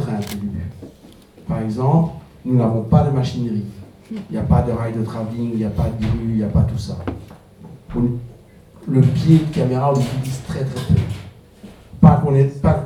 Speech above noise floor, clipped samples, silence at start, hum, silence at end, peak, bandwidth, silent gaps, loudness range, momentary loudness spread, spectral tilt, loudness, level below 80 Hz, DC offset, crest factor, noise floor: 27 dB; under 0.1%; 0 s; none; 0 s; 0 dBFS; 13.5 kHz; none; 4 LU; 16 LU; -8.5 dB/octave; -19 LUFS; -34 dBFS; under 0.1%; 18 dB; -44 dBFS